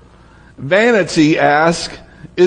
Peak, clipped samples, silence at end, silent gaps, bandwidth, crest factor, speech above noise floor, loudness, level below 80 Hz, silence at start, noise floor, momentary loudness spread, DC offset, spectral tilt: 0 dBFS; under 0.1%; 0 s; none; 10.5 kHz; 14 dB; 30 dB; -13 LUFS; -46 dBFS; 0.6 s; -43 dBFS; 16 LU; under 0.1%; -5 dB/octave